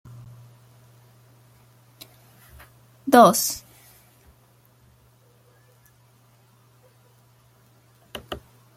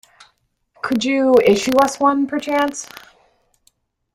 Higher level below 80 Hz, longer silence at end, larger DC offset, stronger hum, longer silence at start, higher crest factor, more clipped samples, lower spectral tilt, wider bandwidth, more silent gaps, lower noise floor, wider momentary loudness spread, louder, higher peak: about the same, -60 dBFS vs -56 dBFS; second, 0.4 s vs 1.3 s; neither; neither; first, 3.05 s vs 0.85 s; first, 26 dB vs 16 dB; neither; about the same, -4 dB/octave vs -4 dB/octave; about the same, 16.5 kHz vs 16 kHz; neither; second, -58 dBFS vs -63 dBFS; first, 33 LU vs 14 LU; second, -19 LUFS vs -16 LUFS; about the same, -2 dBFS vs -2 dBFS